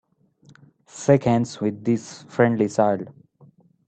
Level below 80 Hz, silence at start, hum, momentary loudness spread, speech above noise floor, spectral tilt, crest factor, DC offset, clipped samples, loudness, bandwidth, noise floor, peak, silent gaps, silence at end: -60 dBFS; 0.95 s; none; 12 LU; 35 dB; -7 dB/octave; 20 dB; under 0.1%; under 0.1%; -22 LUFS; 8.8 kHz; -55 dBFS; -4 dBFS; none; 0.8 s